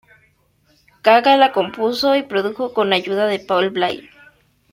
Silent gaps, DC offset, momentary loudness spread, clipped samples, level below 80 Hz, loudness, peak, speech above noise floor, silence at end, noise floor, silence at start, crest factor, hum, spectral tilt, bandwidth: none; under 0.1%; 9 LU; under 0.1%; -62 dBFS; -17 LUFS; -2 dBFS; 43 dB; 0.7 s; -59 dBFS; 1.05 s; 16 dB; none; -5 dB/octave; 16 kHz